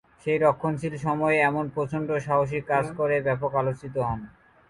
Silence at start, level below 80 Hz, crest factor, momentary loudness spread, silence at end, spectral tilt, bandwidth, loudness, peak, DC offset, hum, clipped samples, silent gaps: 0.25 s; -54 dBFS; 18 dB; 7 LU; 0.4 s; -7.5 dB/octave; 11.5 kHz; -26 LUFS; -8 dBFS; under 0.1%; none; under 0.1%; none